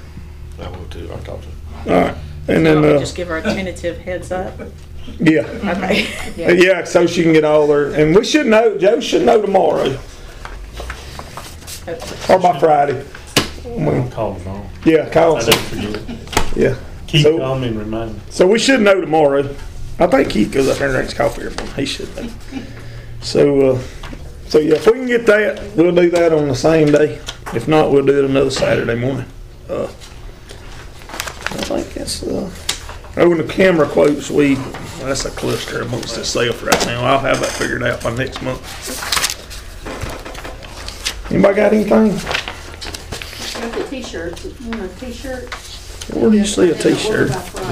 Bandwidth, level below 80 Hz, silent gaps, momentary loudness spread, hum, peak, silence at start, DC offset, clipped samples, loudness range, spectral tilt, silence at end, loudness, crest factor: 16.5 kHz; -34 dBFS; none; 18 LU; none; -2 dBFS; 0 s; 0.5%; under 0.1%; 7 LU; -5 dB/octave; 0 s; -15 LUFS; 14 dB